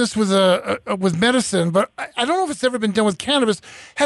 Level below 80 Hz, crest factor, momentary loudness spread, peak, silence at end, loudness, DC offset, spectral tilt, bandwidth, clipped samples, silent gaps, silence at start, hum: -56 dBFS; 12 dB; 7 LU; -6 dBFS; 0 s; -19 LUFS; under 0.1%; -4.5 dB/octave; 11.5 kHz; under 0.1%; none; 0 s; none